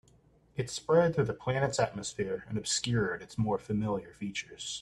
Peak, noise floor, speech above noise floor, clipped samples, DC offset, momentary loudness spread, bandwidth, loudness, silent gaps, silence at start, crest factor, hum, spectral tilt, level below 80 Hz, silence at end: -14 dBFS; -64 dBFS; 32 dB; under 0.1%; under 0.1%; 11 LU; 12.5 kHz; -32 LUFS; none; 0.55 s; 18 dB; none; -4.5 dB/octave; -60 dBFS; 0 s